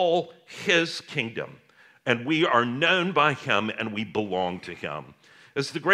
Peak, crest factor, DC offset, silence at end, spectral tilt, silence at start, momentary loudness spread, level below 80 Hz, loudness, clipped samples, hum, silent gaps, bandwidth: -4 dBFS; 22 dB; under 0.1%; 0 s; -4.5 dB/octave; 0 s; 13 LU; -72 dBFS; -25 LUFS; under 0.1%; none; none; 13.5 kHz